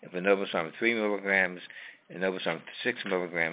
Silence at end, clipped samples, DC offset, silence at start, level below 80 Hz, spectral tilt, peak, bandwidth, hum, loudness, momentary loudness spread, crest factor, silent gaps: 0 s; under 0.1%; under 0.1%; 0 s; -74 dBFS; -2.5 dB/octave; -10 dBFS; 4 kHz; none; -29 LUFS; 15 LU; 20 dB; none